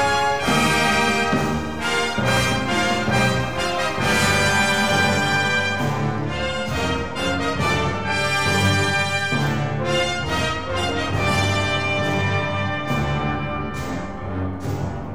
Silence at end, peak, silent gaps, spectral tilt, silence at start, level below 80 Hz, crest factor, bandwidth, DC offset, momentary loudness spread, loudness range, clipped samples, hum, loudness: 0 s; -6 dBFS; none; -4.5 dB/octave; 0 s; -40 dBFS; 16 dB; 17 kHz; 1%; 7 LU; 3 LU; under 0.1%; none; -20 LUFS